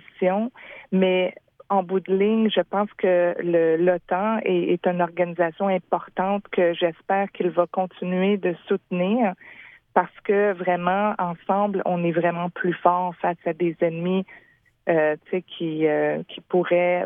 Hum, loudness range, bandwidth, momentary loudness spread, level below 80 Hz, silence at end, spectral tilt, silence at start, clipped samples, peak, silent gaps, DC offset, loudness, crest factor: none; 3 LU; 3.8 kHz; 7 LU; -70 dBFS; 0 s; -10 dB/octave; 0.2 s; under 0.1%; -4 dBFS; none; under 0.1%; -23 LUFS; 20 dB